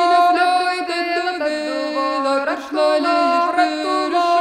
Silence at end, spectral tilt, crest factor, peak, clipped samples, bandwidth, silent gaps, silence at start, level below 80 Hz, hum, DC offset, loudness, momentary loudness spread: 0 s; -2 dB/octave; 14 dB; -4 dBFS; under 0.1%; 12.5 kHz; none; 0 s; -64 dBFS; none; under 0.1%; -18 LUFS; 7 LU